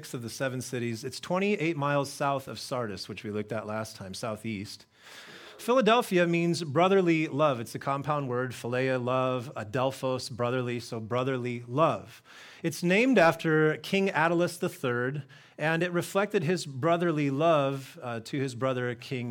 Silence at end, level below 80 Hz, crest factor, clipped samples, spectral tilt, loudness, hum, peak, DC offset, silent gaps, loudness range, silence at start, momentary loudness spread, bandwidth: 0 s; -72 dBFS; 18 dB; under 0.1%; -5.5 dB/octave; -29 LUFS; none; -10 dBFS; under 0.1%; none; 5 LU; 0 s; 14 LU; 18 kHz